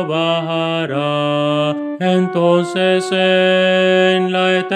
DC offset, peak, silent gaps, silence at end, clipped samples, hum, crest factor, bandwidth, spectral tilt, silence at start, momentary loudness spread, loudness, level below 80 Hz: under 0.1%; 0 dBFS; none; 0 s; under 0.1%; none; 14 dB; 10 kHz; -6 dB/octave; 0 s; 6 LU; -15 LUFS; -72 dBFS